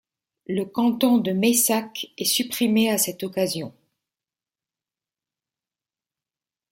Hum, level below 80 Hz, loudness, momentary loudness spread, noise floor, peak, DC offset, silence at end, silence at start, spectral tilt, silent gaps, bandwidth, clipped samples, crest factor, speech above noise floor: none; -68 dBFS; -22 LUFS; 10 LU; under -90 dBFS; -6 dBFS; under 0.1%; 3 s; 0.5 s; -3.5 dB/octave; none; 16.5 kHz; under 0.1%; 20 dB; over 68 dB